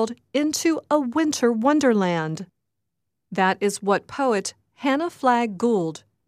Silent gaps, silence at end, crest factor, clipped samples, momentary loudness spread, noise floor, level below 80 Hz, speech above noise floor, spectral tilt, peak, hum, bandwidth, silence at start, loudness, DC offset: none; 0.3 s; 18 dB; under 0.1%; 11 LU; -81 dBFS; -70 dBFS; 60 dB; -4.5 dB/octave; -6 dBFS; none; 15 kHz; 0 s; -22 LUFS; under 0.1%